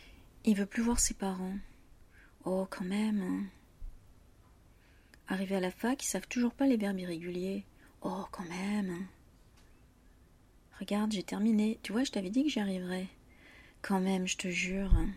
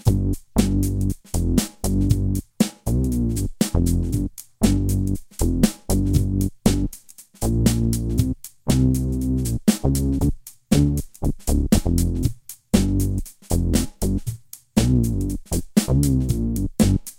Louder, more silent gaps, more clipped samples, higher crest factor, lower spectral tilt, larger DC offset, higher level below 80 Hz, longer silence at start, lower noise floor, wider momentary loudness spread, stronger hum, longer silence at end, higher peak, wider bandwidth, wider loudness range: second, -34 LUFS vs -22 LUFS; neither; neither; about the same, 22 dB vs 18 dB; second, -4.5 dB/octave vs -6 dB/octave; neither; second, -44 dBFS vs -28 dBFS; about the same, 0 s vs 0.05 s; first, -62 dBFS vs -44 dBFS; first, 13 LU vs 7 LU; neither; about the same, 0 s vs 0.05 s; second, -14 dBFS vs -2 dBFS; about the same, 15.5 kHz vs 17 kHz; first, 6 LU vs 1 LU